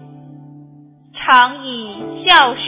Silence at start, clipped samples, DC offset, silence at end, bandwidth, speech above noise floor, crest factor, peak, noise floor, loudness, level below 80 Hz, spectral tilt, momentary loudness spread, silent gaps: 1.15 s; 0.2%; under 0.1%; 0 s; 4 kHz; 30 dB; 16 dB; 0 dBFS; -44 dBFS; -12 LUFS; -58 dBFS; -6.5 dB/octave; 17 LU; none